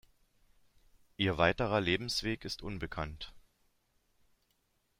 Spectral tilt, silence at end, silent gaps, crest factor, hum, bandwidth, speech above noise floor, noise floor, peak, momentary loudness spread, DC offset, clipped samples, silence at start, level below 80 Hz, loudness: -5 dB/octave; 1.6 s; none; 24 dB; none; 16 kHz; 43 dB; -76 dBFS; -12 dBFS; 13 LU; under 0.1%; under 0.1%; 1.2 s; -54 dBFS; -33 LUFS